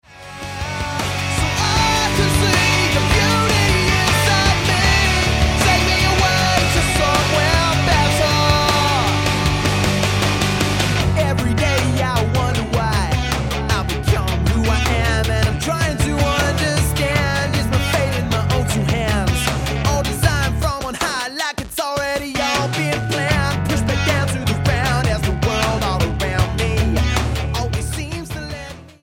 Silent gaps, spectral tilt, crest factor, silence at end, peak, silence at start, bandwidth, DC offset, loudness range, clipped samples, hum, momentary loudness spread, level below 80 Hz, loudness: none; -4.5 dB/octave; 18 dB; 0.15 s; 0 dBFS; 0.1 s; 17 kHz; under 0.1%; 5 LU; under 0.1%; none; 7 LU; -26 dBFS; -17 LUFS